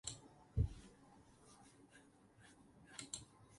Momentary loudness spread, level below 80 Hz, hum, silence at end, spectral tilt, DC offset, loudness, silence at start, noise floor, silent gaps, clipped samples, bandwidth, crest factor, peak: 23 LU; -54 dBFS; none; 0 s; -4.5 dB/octave; under 0.1%; -47 LUFS; 0.05 s; -67 dBFS; none; under 0.1%; 11.5 kHz; 24 dB; -26 dBFS